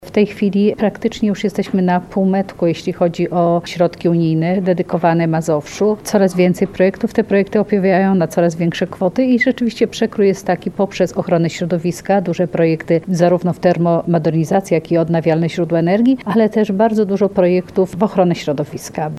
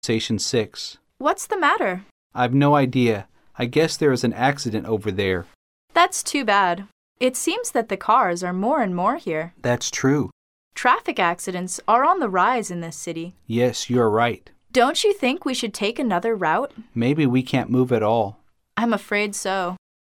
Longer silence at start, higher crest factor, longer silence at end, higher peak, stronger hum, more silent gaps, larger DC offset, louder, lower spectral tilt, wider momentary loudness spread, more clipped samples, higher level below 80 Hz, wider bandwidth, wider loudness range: about the same, 0 s vs 0.05 s; about the same, 16 dB vs 18 dB; second, 0 s vs 0.4 s; first, 0 dBFS vs -4 dBFS; neither; second, none vs 2.11-2.30 s, 5.55-5.88 s, 6.92-7.15 s, 10.32-10.71 s; neither; first, -16 LUFS vs -21 LUFS; first, -7 dB/octave vs -4.5 dB/octave; second, 5 LU vs 11 LU; neither; first, -50 dBFS vs -60 dBFS; second, 13.5 kHz vs 17 kHz; about the same, 2 LU vs 1 LU